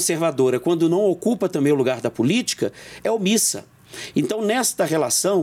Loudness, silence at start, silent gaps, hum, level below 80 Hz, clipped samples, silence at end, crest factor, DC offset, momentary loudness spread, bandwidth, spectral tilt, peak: -20 LUFS; 0 s; none; none; -66 dBFS; under 0.1%; 0 s; 12 dB; under 0.1%; 8 LU; 17 kHz; -4 dB/octave; -8 dBFS